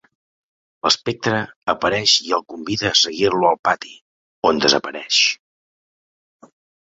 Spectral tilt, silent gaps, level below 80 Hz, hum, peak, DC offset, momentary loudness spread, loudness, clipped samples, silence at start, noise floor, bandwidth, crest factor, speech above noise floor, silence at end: -2.5 dB/octave; 1.56-1.62 s, 3.59-3.63 s, 4.01-4.42 s; -56 dBFS; none; 0 dBFS; under 0.1%; 9 LU; -18 LUFS; under 0.1%; 0.85 s; under -90 dBFS; 8.2 kHz; 20 dB; over 71 dB; 1.5 s